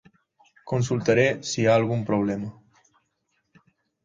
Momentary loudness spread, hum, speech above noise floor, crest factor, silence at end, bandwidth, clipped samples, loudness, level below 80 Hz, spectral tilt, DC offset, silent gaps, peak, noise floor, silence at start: 9 LU; none; 51 dB; 18 dB; 1.55 s; 9.4 kHz; under 0.1%; -23 LUFS; -60 dBFS; -5.5 dB/octave; under 0.1%; none; -8 dBFS; -74 dBFS; 0.65 s